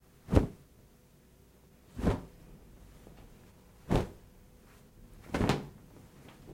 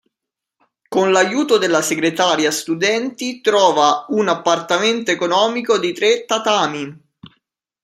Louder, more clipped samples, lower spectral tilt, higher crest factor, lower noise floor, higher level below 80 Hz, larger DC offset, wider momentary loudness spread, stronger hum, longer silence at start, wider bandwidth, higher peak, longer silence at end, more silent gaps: second, -33 LUFS vs -16 LUFS; neither; first, -7 dB/octave vs -3 dB/octave; first, 28 dB vs 18 dB; second, -61 dBFS vs -83 dBFS; first, -44 dBFS vs -66 dBFS; neither; first, 26 LU vs 6 LU; neither; second, 0.3 s vs 0.9 s; about the same, 16.5 kHz vs 15.5 kHz; second, -10 dBFS vs 0 dBFS; second, 0 s vs 0.55 s; neither